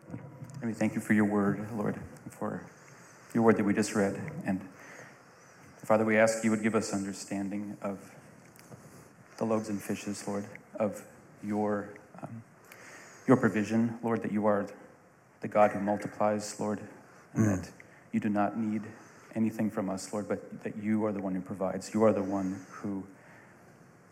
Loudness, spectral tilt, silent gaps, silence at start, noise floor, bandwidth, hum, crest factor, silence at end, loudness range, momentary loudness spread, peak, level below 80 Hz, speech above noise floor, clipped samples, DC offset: -31 LUFS; -6.5 dB/octave; none; 0.05 s; -59 dBFS; 15 kHz; none; 22 dB; 0.7 s; 7 LU; 21 LU; -10 dBFS; -72 dBFS; 29 dB; under 0.1%; under 0.1%